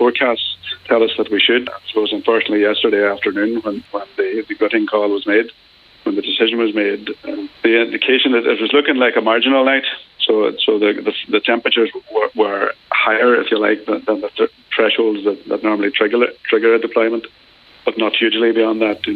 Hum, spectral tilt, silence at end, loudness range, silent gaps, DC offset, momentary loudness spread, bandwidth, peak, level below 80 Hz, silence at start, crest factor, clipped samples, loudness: none; -6.5 dB/octave; 0 s; 3 LU; none; under 0.1%; 8 LU; 4.9 kHz; -2 dBFS; -64 dBFS; 0 s; 14 dB; under 0.1%; -16 LUFS